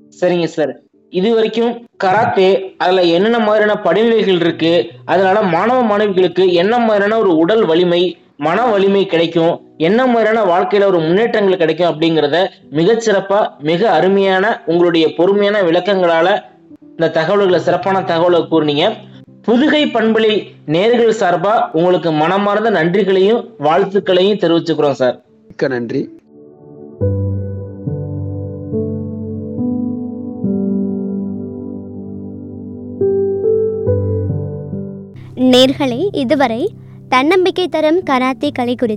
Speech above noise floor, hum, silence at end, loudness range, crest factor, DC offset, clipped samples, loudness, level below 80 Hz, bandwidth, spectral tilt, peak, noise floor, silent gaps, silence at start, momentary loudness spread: 28 dB; none; 0 s; 8 LU; 14 dB; under 0.1%; under 0.1%; -14 LUFS; -56 dBFS; 10 kHz; -6.5 dB/octave; 0 dBFS; -41 dBFS; none; 0.2 s; 12 LU